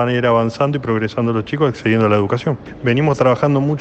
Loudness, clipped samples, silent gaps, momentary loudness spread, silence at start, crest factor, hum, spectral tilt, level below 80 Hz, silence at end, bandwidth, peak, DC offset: -17 LUFS; under 0.1%; none; 5 LU; 0 s; 14 dB; none; -7.5 dB/octave; -48 dBFS; 0 s; 8.4 kHz; -2 dBFS; under 0.1%